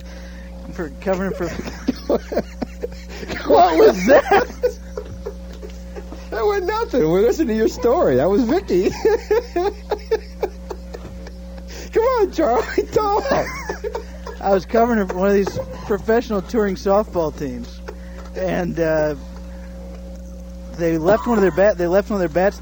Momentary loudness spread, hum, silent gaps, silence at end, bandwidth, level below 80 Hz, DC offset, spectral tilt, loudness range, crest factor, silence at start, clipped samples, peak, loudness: 19 LU; none; none; 0 s; over 20 kHz; -34 dBFS; under 0.1%; -6 dB/octave; 6 LU; 16 dB; 0 s; under 0.1%; -2 dBFS; -19 LUFS